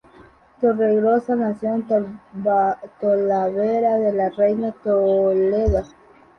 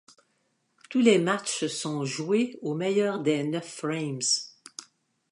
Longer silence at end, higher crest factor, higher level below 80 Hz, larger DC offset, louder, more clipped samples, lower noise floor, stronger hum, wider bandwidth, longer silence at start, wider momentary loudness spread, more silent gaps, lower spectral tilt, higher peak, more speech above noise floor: about the same, 0.5 s vs 0.5 s; second, 14 dB vs 20 dB; first, -38 dBFS vs -80 dBFS; neither; first, -20 LUFS vs -27 LUFS; neither; second, -49 dBFS vs -73 dBFS; neither; second, 6.4 kHz vs 11.5 kHz; second, 0.6 s vs 0.9 s; second, 6 LU vs 10 LU; neither; first, -9.5 dB/octave vs -4 dB/octave; about the same, -6 dBFS vs -8 dBFS; second, 30 dB vs 47 dB